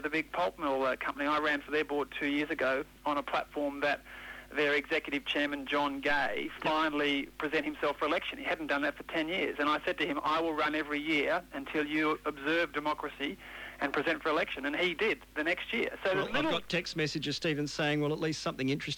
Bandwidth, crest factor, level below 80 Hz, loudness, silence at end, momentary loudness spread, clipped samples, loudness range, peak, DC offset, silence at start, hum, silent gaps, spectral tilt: 19.5 kHz; 16 dB; -60 dBFS; -32 LUFS; 0 s; 5 LU; under 0.1%; 1 LU; -16 dBFS; under 0.1%; 0 s; none; none; -4.5 dB/octave